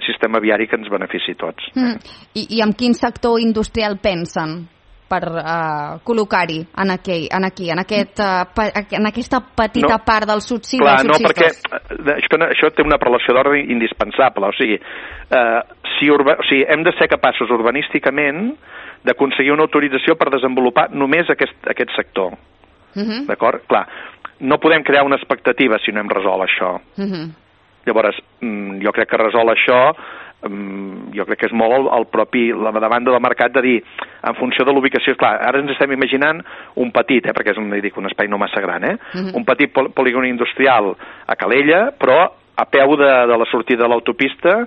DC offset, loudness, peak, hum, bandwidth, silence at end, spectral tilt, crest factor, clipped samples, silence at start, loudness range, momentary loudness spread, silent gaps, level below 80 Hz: under 0.1%; -16 LUFS; 0 dBFS; none; 8.4 kHz; 0 s; -5.5 dB/octave; 16 dB; under 0.1%; 0 s; 5 LU; 11 LU; none; -46 dBFS